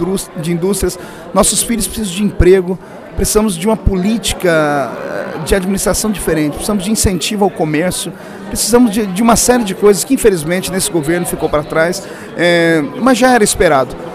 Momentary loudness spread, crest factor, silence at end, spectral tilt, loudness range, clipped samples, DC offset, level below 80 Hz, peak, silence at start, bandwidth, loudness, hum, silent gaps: 10 LU; 14 dB; 0 s; -4 dB/octave; 3 LU; 0.1%; under 0.1%; -28 dBFS; 0 dBFS; 0 s; 16.5 kHz; -13 LUFS; none; none